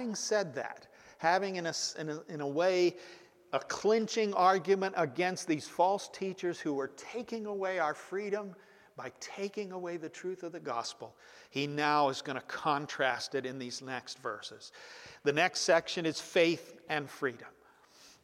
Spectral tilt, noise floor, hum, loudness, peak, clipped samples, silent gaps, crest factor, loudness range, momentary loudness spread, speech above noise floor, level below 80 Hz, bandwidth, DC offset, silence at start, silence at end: -3.5 dB/octave; -62 dBFS; none; -33 LUFS; -12 dBFS; under 0.1%; none; 22 dB; 7 LU; 15 LU; 28 dB; -80 dBFS; 15.5 kHz; under 0.1%; 0 s; 0.15 s